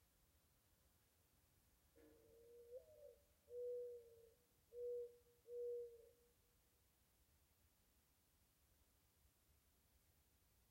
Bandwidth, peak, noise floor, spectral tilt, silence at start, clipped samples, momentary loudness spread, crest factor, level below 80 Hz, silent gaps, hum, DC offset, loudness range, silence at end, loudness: 16 kHz; -44 dBFS; -80 dBFS; -4.5 dB/octave; 0 s; under 0.1%; 16 LU; 16 dB; -84 dBFS; none; none; under 0.1%; 14 LU; 0.1 s; -55 LUFS